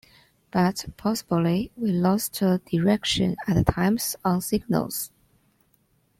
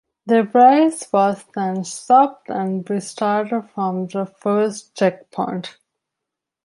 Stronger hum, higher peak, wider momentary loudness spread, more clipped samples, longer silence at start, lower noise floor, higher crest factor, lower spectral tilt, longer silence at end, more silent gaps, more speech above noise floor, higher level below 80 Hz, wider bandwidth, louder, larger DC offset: neither; about the same, -2 dBFS vs -2 dBFS; second, 6 LU vs 13 LU; neither; first, 0.55 s vs 0.25 s; second, -66 dBFS vs -83 dBFS; about the same, 22 dB vs 18 dB; about the same, -5.5 dB/octave vs -5.5 dB/octave; first, 1.1 s vs 0.95 s; neither; second, 42 dB vs 65 dB; first, -46 dBFS vs -72 dBFS; first, 16.5 kHz vs 11.5 kHz; second, -24 LUFS vs -19 LUFS; neither